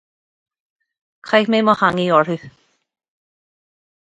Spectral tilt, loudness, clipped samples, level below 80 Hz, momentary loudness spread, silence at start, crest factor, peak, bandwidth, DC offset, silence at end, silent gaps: -6.5 dB/octave; -16 LUFS; under 0.1%; -62 dBFS; 7 LU; 1.25 s; 20 dB; 0 dBFS; 9 kHz; under 0.1%; 1.65 s; none